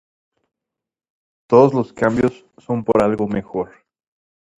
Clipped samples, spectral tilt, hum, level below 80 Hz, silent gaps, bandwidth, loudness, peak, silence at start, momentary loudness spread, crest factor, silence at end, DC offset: under 0.1%; -8.5 dB/octave; none; -52 dBFS; none; 10.5 kHz; -18 LUFS; 0 dBFS; 1.5 s; 13 LU; 20 dB; 0.95 s; under 0.1%